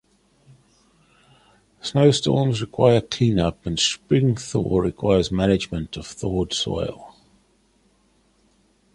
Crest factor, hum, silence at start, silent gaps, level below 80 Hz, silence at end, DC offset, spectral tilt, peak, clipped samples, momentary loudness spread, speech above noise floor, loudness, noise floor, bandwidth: 20 dB; none; 1.85 s; none; -44 dBFS; 1.85 s; under 0.1%; -5.5 dB/octave; -2 dBFS; under 0.1%; 12 LU; 41 dB; -21 LUFS; -62 dBFS; 11.5 kHz